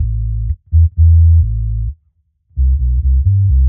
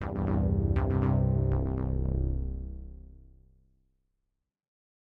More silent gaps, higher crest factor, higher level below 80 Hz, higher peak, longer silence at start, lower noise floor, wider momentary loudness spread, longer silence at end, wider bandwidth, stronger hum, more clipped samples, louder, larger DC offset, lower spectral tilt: neither; second, 10 dB vs 16 dB; first, -14 dBFS vs -36 dBFS; first, -2 dBFS vs -14 dBFS; about the same, 0 s vs 0 s; second, -60 dBFS vs -82 dBFS; about the same, 12 LU vs 14 LU; second, 0 s vs 2.15 s; second, 0.4 kHz vs 3.5 kHz; neither; neither; first, -14 LUFS vs -29 LUFS; neither; first, -20 dB/octave vs -12 dB/octave